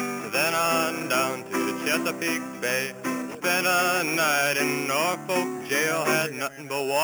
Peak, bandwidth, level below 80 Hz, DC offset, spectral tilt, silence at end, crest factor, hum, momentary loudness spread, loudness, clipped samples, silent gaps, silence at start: -10 dBFS; over 20 kHz; -72 dBFS; under 0.1%; -2.5 dB/octave; 0 s; 16 dB; none; 7 LU; -24 LUFS; under 0.1%; none; 0 s